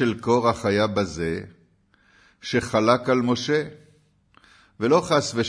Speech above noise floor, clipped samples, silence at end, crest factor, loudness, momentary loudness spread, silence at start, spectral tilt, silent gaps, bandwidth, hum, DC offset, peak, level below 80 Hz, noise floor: 39 dB; under 0.1%; 0 s; 20 dB; -22 LUFS; 9 LU; 0 s; -5.5 dB/octave; none; 11 kHz; none; under 0.1%; -4 dBFS; -54 dBFS; -61 dBFS